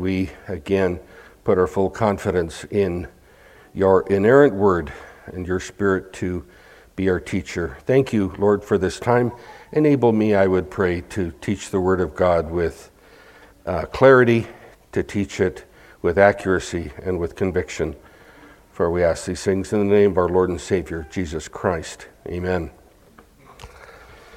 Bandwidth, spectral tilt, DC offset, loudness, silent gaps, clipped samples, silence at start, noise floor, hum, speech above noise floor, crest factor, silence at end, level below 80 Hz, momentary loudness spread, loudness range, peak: 14 kHz; -6.5 dB/octave; under 0.1%; -21 LUFS; none; under 0.1%; 0 s; -51 dBFS; none; 31 dB; 20 dB; 0 s; -46 dBFS; 13 LU; 5 LU; 0 dBFS